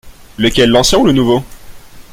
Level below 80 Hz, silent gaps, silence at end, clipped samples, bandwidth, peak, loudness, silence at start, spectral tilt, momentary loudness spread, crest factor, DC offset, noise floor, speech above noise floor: -30 dBFS; none; 0.1 s; under 0.1%; 16.5 kHz; 0 dBFS; -11 LUFS; 0.05 s; -4.5 dB/octave; 7 LU; 12 dB; under 0.1%; -32 dBFS; 22 dB